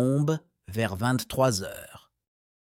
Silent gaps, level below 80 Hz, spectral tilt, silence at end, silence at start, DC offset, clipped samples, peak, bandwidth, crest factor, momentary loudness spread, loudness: none; -58 dBFS; -5.5 dB/octave; 0.65 s; 0 s; under 0.1%; under 0.1%; -10 dBFS; 17 kHz; 18 dB; 15 LU; -27 LUFS